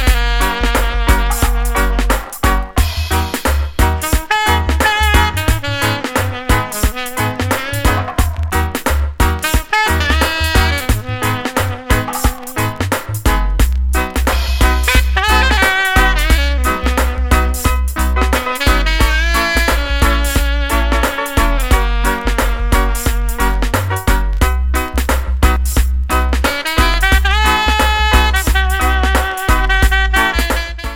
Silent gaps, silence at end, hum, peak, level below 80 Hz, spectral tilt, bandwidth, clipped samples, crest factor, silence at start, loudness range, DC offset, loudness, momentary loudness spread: none; 0 s; none; 0 dBFS; -16 dBFS; -4 dB/octave; 17 kHz; under 0.1%; 14 dB; 0 s; 4 LU; under 0.1%; -15 LUFS; 6 LU